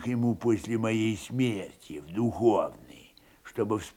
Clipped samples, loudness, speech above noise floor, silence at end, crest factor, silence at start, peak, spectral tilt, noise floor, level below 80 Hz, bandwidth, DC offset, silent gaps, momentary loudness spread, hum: under 0.1%; -29 LUFS; 28 dB; 0.05 s; 18 dB; 0 s; -12 dBFS; -6.5 dB/octave; -56 dBFS; -62 dBFS; 16.5 kHz; under 0.1%; none; 12 LU; none